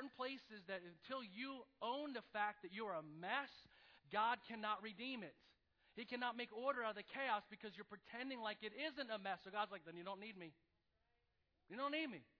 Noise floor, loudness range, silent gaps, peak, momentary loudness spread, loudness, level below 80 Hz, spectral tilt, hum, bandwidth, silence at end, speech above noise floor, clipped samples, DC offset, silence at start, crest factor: -85 dBFS; 4 LU; none; -28 dBFS; 12 LU; -47 LUFS; -88 dBFS; -1 dB/octave; none; 5.4 kHz; 0.15 s; 37 dB; under 0.1%; under 0.1%; 0 s; 20 dB